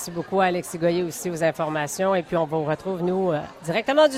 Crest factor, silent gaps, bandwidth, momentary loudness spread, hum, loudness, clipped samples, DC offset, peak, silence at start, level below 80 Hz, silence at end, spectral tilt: 18 dB; none; 16 kHz; 4 LU; none; -24 LUFS; under 0.1%; under 0.1%; -6 dBFS; 0 s; -60 dBFS; 0 s; -5 dB/octave